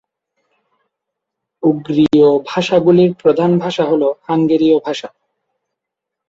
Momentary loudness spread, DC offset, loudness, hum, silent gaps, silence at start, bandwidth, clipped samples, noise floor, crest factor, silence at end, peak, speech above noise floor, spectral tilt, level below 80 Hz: 7 LU; under 0.1%; -14 LUFS; none; none; 1.65 s; 7.8 kHz; under 0.1%; -81 dBFS; 14 dB; 1.2 s; -2 dBFS; 68 dB; -7.5 dB/octave; -56 dBFS